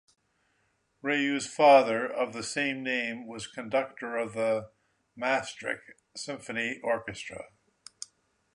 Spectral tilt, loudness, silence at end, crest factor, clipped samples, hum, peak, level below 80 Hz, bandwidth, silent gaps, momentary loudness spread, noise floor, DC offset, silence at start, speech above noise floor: -3.5 dB/octave; -29 LUFS; 1.1 s; 22 dB; under 0.1%; none; -8 dBFS; -70 dBFS; 11 kHz; none; 20 LU; -73 dBFS; under 0.1%; 1.05 s; 44 dB